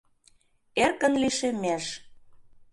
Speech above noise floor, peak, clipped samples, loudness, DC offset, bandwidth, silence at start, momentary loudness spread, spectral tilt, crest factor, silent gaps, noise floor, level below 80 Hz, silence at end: 37 dB; -10 dBFS; under 0.1%; -26 LUFS; under 0.1%; 11.5 kHz; 0.75 s; 11 LU; -3 dB/octave; 20 dB; none; -63 dBFS; -60 dBFS; 0.3 s